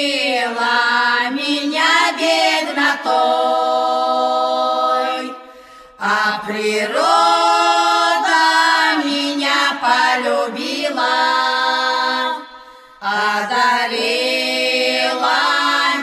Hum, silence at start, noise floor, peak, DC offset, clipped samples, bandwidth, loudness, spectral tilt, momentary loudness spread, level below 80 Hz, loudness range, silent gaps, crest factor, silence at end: none; 0 s; -41 dBFS; -2 dBFS; under 0.1%; under 0.1%; 14 kHz; -15 LUFS; -1.5 dB/octave; 6 LU; -70 dBFS; 4 LU; none; 16 dB; 0 s